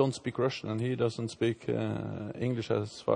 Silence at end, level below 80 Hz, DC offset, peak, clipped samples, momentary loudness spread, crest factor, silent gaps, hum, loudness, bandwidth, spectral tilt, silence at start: 0 s; -66 dBFS; under 0.1%; -12 dBFS; under 0.1%; 4 LU; 20 dB; none; none; -33 LUFS; 10 kHz; -6.5 dB/octave; 0 s